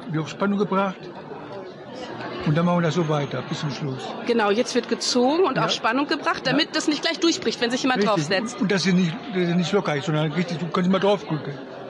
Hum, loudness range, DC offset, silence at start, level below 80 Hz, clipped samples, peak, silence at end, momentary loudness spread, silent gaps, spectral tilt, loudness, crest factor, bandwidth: none; 4 LU; under 0.1%; 0 s; -64 dBFS; under 0.1%; -8 dBFS; 0 s; 13 LU; none; -5 dB/octave; -22 LUFS; 14 dB; 11.5 kHz